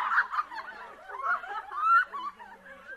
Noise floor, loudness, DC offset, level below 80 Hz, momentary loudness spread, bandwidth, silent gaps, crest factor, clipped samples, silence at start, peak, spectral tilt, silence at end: -49 dBFS; -28 LUFS; under 0.1%; -72 dBFS; 23 LU; 12.5 kHz; none; 16 dB; under 0.1%; 0 s; -14 dBFS; -1.5 dB/octave; 0 s